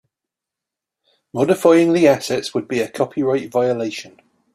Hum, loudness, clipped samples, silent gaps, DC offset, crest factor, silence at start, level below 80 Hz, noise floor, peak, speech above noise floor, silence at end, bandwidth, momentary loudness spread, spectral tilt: none; -18 LUFS; under 0.1%; none; under 0.1%; 18 dB; 1.35 s; -62 dBFS; -85 dBFS; -2 dBFS; 68 dB; 0.45 s; 14.5 kHz; 11 LU; -5.5 dB/octave